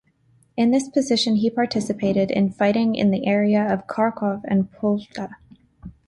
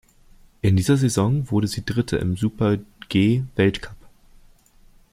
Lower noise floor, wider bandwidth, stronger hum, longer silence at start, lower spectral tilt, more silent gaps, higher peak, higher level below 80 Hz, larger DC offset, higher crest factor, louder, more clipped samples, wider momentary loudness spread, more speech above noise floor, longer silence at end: first, -60 dBFS vs -52 dBFS; second, 11.5 kHz vs 15.5 kHz; neither; about the same, 0.55 s vs 0.65 s; about the same, -6 dB/octave vs -6.5 dB/octave; neither; second, -8 dBFS vs -4 dBFS; second, -56 dBFS vs -46 dBFS; neither; about the same, 14 dB vs 18 dB; about the same, -21 LUFS vs -21 LUFS; neither; about the same, 7 LU vs 6 LU; first, 39 dB vs 32 dB; second, 0.2 s vs 1.05 s